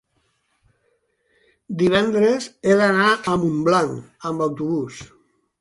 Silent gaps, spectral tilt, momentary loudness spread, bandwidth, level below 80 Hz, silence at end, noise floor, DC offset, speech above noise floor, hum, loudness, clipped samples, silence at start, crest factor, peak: none; -5.5 dB/octave; 14 LU; 11.5 kHz; -56 dBFS; 0.55 s; -68 dBFS; under 0.1%; 49 dB; none; -19 LUFS; under 0.1%; 1.7 s; 18 dB; -2 dBFS